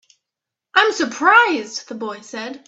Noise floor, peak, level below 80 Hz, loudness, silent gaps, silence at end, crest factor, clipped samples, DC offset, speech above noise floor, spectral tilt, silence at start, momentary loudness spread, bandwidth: -85 dBFS; 0 dBFS; -70 dBFS; -16 LUFS; none; 0.1 s; 20 dB; under 0.1%; under 0.1%; 66 dB; -1.5 dB/octave; 0.75 s; 17 LU; 8.2 kHz